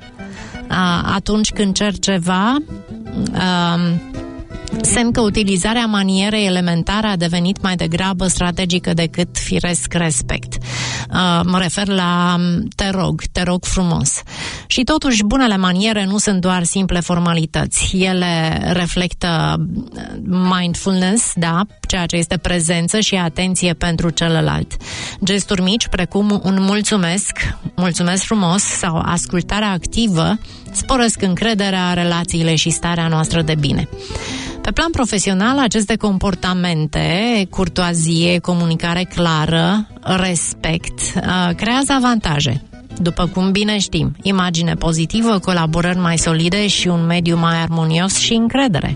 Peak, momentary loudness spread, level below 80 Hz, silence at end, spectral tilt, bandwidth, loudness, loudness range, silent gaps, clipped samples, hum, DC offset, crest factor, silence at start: -2 dBFS; 7 LU; -32 dBFS; 0 s; -4.5 dB/octave; 11 kHz; -16 LUFS; 2 LU; none; under 0.1%; none; under 0.1%; 14 dB; 0 s